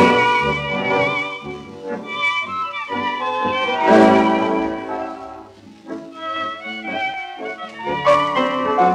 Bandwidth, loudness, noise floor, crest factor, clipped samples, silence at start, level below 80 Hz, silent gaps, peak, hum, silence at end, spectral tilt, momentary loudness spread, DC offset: 11.5 kHz; -19 LUFS; -41 dBFS; 18 dB; under 0.1%; 0 s; -52 dBFS; none; -2 dBFS; none; 0 s; -5.5 dB/octave; 17 LU; under 0.1%